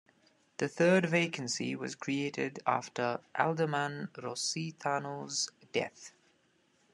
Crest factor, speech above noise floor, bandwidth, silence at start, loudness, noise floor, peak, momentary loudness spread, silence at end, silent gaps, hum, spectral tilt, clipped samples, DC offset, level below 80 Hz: 22 dB; 38 dB; 12 kHz; 0.6 s; -33 LUFS; -71 dBFS; -12 dBFS; 11 LU; 0.85 s; none; none; -4 dB/octave; under 0.1%; under 0.1%; -80 dBFS